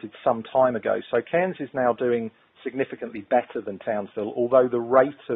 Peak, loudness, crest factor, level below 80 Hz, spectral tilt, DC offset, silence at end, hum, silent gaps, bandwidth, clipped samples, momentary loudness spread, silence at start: -4 dBFS; -24 LUFS; 20 dB; -68 dBFS; -5 dB/octave; under 0.1%; 0 s; none; none; 3.9 kHz; under 0.1%; 11 LU; 0.05 s